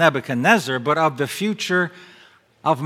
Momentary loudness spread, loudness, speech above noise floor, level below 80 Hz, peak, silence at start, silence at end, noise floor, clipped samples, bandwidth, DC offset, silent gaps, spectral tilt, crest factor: 7 LU; -20 LUFS; 30 dB; -70 dBFS; 0 dBFS; 0 s; 0 s; -49 dBFS; under 0.1%; 16.5 kHz; under 0.1%; none; -5 dB/octave; 20 dB